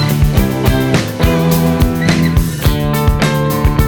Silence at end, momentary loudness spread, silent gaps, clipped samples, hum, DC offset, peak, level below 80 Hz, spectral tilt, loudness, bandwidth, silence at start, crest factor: 0 s; 2 LU; none; under 0.1%; none; under 0.1%; 0 dBFS; -18 dBFS; -6 dB/octave; -13 LUFS; over 20 kHz; 0 s; 12 dB